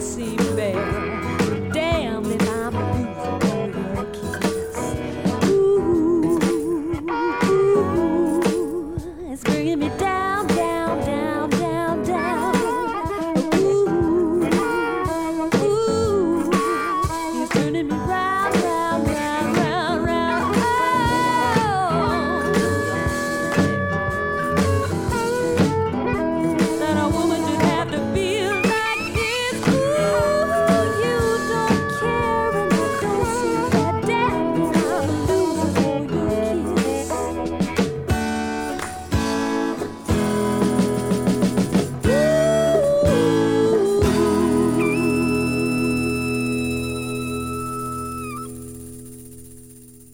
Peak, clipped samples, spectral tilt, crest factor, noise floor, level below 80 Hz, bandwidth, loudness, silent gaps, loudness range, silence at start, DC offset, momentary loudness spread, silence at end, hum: -4 dBFS; under 0.1%; -5.5 dB/octave; 16 dB; -44 dBFS; -40 dBFS; 17.5 kHz; -21 LUFS; none; 4 LU; 0 s; under 0.1%; 7 LU; 0.1 s; none